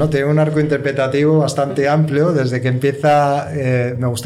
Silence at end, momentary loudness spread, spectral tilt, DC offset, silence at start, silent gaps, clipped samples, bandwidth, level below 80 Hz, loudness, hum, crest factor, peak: 0 s; 4 LU; -7 dB/octave; under 0.1%; 0 s; none; under 0.1%; 13.5 kHz; -48 dBFS; -16 LUFS; none; 10 dB; -6 dBFS